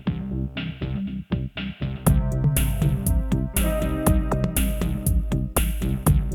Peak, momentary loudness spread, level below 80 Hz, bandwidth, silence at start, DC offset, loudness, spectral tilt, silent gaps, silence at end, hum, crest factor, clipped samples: -4 dBFS; 8 LU; -26 dBFS; 17.5 kHz; 0 s; under 0.1%; -24 LUFS; -6 dB/octave; none; 0 s; none; 18 dB; under 0.1%